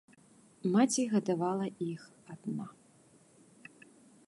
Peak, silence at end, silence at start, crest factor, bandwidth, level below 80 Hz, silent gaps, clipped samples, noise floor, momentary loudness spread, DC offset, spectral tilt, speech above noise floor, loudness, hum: -16 dBFS; 1.55 s; 0.65 s; 18 dB; 11.5 kHz; -82 dBFS; none; under 0.1%; -63 dBFS; 26 LU; under 0.1%; -5.5 dB/octave; 31 dB; -33 LUFS; none